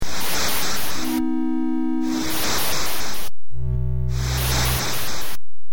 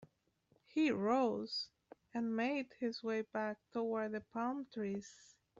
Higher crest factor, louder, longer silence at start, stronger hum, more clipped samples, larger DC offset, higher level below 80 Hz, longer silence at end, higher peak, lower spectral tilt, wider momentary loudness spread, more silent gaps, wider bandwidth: about the same, 14 dB vs 18 dB; first, -23 LUFS vs -39 LUFS; about the same, 0 s vs 0 s; neither; neither; first, 10% vs under 0.1%; first, -32 dBFS vs -80 dBFS; second, 0 s vs 0.45 s; first, -8 dBFS vs -22 dBFS; about the same, -3.5 dB/octave vs -3.5 dB/octave; about the same, 9 LU vs 9 LU; neither; first, over 20 kHz vs 7.8 kHz